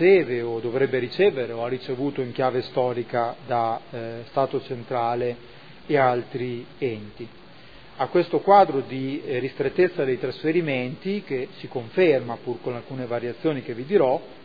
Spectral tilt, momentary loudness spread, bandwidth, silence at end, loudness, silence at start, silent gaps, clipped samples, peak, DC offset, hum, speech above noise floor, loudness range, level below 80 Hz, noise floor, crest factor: -9 dB/octave; 11 LU; 5 kHz; 0.05 s; -24 LUFS; 0 s; none; under 0.1%; -4 dBFS; 0.4%; none; 24 dB; 4 LU; -64 dBFS; -47 dBFS; 20 dB